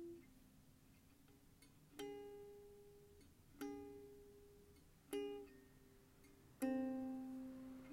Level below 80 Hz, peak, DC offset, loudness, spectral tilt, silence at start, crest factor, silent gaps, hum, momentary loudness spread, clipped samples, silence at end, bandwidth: -74 dBFS; -32 dBFS; under 0.1%; -51 LUFS; -5.5 dB/octave; 0 s; 20 dB; none; none; 23 LU; under 0.1%; 0 s; 16 kHz